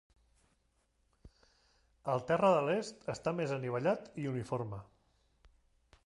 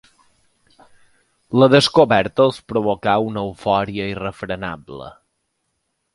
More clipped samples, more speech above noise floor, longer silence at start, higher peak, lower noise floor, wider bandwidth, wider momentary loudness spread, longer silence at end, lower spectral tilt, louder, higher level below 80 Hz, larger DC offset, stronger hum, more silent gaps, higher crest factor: neither; second, 42 dB vs 55 dB; second, 1.25 s vs 1.5 s; second, -16 dBFS vs 0 dBFS; first, -76 dBFS vs -72 dBFS; about the same, 11.5 kHz vs 11.5 kHz; second, 13 LU vs 17 LU; first, 1.25 s vs 1.05 s; about the same, -6.5 dB/octave vs -5.5 dB/octave; second, -35 LUFS vs -18 LUFS; second, -68 dBFS vs -50 dBFS; neither; neither; neither; about the same, 20 dB vs 20 dB